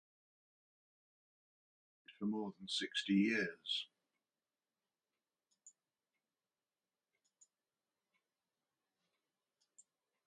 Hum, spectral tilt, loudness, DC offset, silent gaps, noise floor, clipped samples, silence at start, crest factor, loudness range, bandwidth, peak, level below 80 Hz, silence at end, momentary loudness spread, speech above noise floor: none; -4.5 dB/octave; -39 LUFS; under 0.1%; none; under -90 dBFS; under 0.1%; 2.1 s; 24 dB; 6 LU; 10 kHz; -24 dBFS; -88 dBFS; 4.6 s; 10 LU; over 51 dB